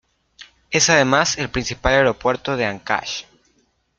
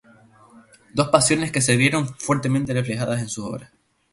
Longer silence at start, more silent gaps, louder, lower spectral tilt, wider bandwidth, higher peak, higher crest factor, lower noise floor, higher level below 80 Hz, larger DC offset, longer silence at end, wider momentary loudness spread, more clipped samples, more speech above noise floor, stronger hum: second, 0.4 s vs 0.55 s; neither; first, -18 LUFS vs -21 LUFS; second, -3 dB/octave vs -4.5 dB/octave; second, 10 kHz vs 11.5 kHz; about the same, 0 dBFS vs 0 dBFS; about the same, 20 dB vs 22 dB; first, -64 dBFS vs -52 dBFS; first, -40 dBFS vs -54 dBFS; neither; first, 0.75 s vs 0.5 s; second, 9 LU vs 12 LU; neither; first, 45 dB vs 31 dB; neither